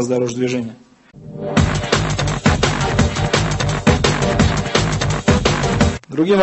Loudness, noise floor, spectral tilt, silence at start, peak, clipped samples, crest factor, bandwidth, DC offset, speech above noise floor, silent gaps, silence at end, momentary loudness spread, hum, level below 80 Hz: -17 LUFS; -37 dBFS; -5 dB/octave; 0 s; 0 dBFS; under 0.1%; 16 dB; 8.6 kHz; under 0.1%; 20 dB; none; 0 s; 5 LU; none; -28 dBFS